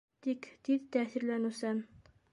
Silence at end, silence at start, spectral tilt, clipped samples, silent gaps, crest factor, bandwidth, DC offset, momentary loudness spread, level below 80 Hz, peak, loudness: 0.5 s; 0.25 s; -5.5 dB/octave; under 0.1%; none; 18 dB; 11.5 kHz; under 0.1%; 7 LU; -74 dBFS; -18 dBFS; -36 LUFS